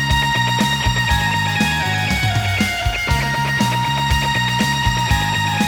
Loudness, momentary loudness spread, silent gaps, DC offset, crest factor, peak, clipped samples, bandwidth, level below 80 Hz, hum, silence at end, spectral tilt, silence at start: -17 LUFS; 2 LU; none; under 0.1%; 16 dB; -2 dBFS; under 0.1%; over 20 kHz; -28 dBFS; none; 0 s; -4 dB/octave; 0 s